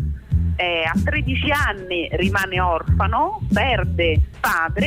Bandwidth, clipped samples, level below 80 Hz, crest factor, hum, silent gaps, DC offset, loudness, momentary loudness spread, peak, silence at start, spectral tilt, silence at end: 16 kHz; under 0.1%; -28 dBFS; 12 dB; none; none; under 0.1%; -20 LUFS; 3 LU; -8 dBFS; 0 s; -6 dB/octave; 0 s